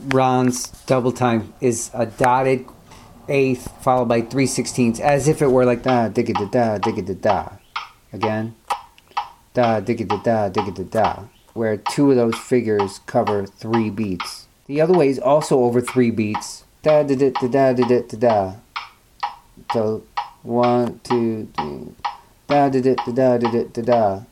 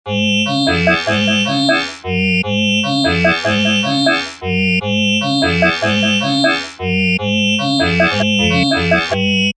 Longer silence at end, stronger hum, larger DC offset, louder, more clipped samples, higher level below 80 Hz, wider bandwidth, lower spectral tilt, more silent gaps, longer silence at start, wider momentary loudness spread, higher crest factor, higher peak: about the same, 0.05 s vs 0.05 s; neither; neither; second, -20 LUFS vs -14 LUFS; neither; about the same, -50 dBFS vs -46 dBFS; first, 15 kHz vs 9.8 kHz; first, -6 dB/octave vs -4.5 dB/octave; neither; about the same, 0 s vs 0.05 s; first, 13 LU vs 3 LU; first, 20 dB vs 14 dB; about the same, 0 dBFS vs 0 dBFS